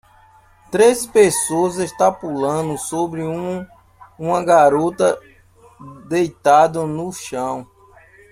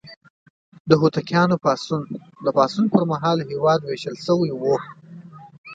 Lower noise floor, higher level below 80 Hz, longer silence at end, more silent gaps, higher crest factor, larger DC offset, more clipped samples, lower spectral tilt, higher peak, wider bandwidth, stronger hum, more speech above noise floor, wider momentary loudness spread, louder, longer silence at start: first, -50 dBFS vs -41 dBFS; first, -56 dBFS vs -64 dBFS; first, 0.65 s vs 0 s; second, none vs 0.17-0.21 s, 0.30-0.72 s, 0.80-0.85 s, 5.58-5.64 s; about the same, 18 dB vs 20 dB; neither; neither; second, -4.5 dB/octave vs -7 dB/octave; about the same, 0 dBFS vs 0 dBFS; first, 16 kHz vs 7.8 kHz; neither; first, 33 dB vs 22 dB; about the same, 13 LU vs 11 LU; first, -18 LUFS vs -21 LUFS; first, 0.7 s vs 0.05 s